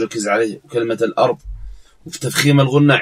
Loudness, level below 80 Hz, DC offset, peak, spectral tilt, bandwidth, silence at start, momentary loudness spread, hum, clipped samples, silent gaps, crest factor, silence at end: -16 LUFS; -40 dBFS; under 0.1%; 0 dBFS; -5.5 dB/octave; 16 kHz; 0 s; 18 LU; none; under 0.1%; none; 16 dB; 0 s